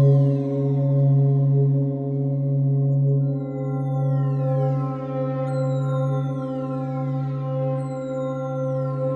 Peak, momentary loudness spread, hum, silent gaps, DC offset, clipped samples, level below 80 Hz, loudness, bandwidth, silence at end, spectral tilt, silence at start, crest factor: -8 dBFS; 8 LU; none; none; under 0.1%; under 0.1%; -58 dBFS; -23 LUFS; 4.1 kHz; 0 s; -11 dB/octave; 0 s; 14 dB